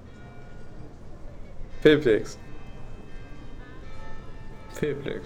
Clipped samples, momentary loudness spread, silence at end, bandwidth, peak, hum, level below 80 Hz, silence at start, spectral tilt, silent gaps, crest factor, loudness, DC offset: under 0.1%; 25 LU; 0 s; 16 kHz; -6 dBFS; none; -42 dBFS; 0 s; -6 dB/octave; none; 22 dB; -23 LUFS; under 0.1%